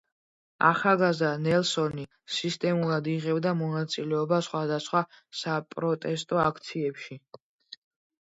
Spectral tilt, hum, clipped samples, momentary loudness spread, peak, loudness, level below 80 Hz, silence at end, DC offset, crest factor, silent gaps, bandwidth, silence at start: -5.5 dB/octave; none; under 0.1%; 10 LU; -6 dBFS; -27 LUFS; -68 dBFS; 0.5 s; under 0.1%; 22 dB; 7.40-7.59 s; 8 kHz; 0.6 s